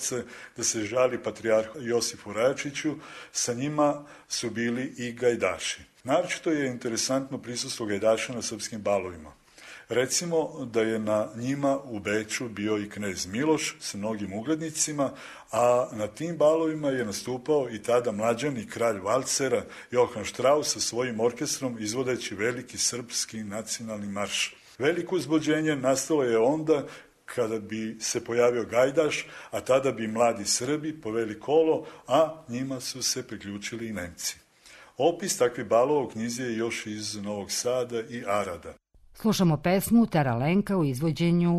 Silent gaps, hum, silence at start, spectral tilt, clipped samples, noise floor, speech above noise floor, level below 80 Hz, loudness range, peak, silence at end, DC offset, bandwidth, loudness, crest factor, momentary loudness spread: none; none; 0 s; -4 dB/octave; under 0.1%; -53 dBFS; 26 dB; -62 dBFS; 3 LU; -10 dBFS; 0 s; under 0.1%; 13 kHz; -27 LUFS; 16 dB; 9 LU